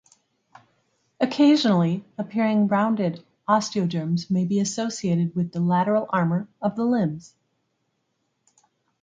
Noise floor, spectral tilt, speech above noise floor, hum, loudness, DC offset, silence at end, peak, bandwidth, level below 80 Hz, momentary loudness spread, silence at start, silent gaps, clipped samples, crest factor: -74 dBFS; -6 dB/octave; 52 dB; none; -23 LUFS; under 0.1%; 1.8 s; -6 dBFS; 9.2 kHz; -68 dBFS; 9 LU; 1.2 s; none; under 0.1%; 18 dB